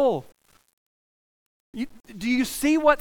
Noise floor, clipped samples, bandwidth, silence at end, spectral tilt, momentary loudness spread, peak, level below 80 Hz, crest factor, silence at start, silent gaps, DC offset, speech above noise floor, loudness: under -90 dBFS; under 0.1%; 19.5 kHz; 0 s; -4 dB/octave; 15 LU; -4 dBFS; -54 dBFS; 22 dB; 0 s; 0.73-1.73 s; under 0.1%; over 67 dB; -25 LUFS